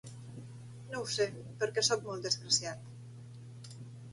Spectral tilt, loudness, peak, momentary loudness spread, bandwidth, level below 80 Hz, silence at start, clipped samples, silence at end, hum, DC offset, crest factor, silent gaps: -2.5 dB/octave; -33 LUFS; -16 dBFS; 21 LU; 11.5 kHz; -72 dBFS; 0.05 s; under 0.1%; 0 s; none; under 0.1%; 22 dB; none